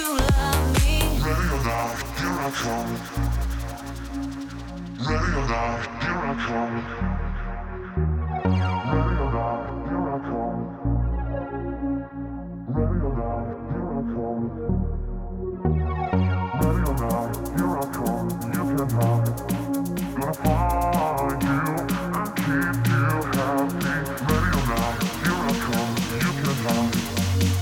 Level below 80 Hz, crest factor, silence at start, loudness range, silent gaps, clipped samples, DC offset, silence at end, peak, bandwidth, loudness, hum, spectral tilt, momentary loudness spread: -32 dBFS; 12 dB; 0 s; 5 LU; none; under 0.1%; under 0.1%; 0 s; -12 dBFS; 20 kHz; -25 LUFS; none; -6 dB/octave; 8 LU